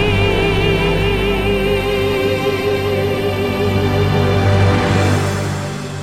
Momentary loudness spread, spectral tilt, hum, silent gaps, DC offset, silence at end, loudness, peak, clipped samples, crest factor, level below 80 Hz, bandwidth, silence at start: 4 LU; -6 dB/octave; none; none; under 0.1%; 0 s; -16 LUFS; -2 dBFS; under 0.1%; 14 dB; -28 dBFS; 15 kHz; 0 s